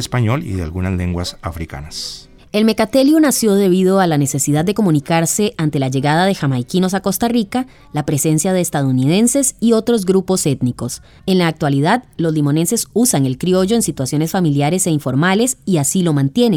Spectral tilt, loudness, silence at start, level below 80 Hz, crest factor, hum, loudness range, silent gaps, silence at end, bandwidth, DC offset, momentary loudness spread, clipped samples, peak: -5 dB/octave; -16 LUFS; 0 s; -44 dBFS; 14 dB; none; 3 LU; none; 0 s; 20 kHz; under 0.1%; 10 LU; under 0.1%; -2 dBFS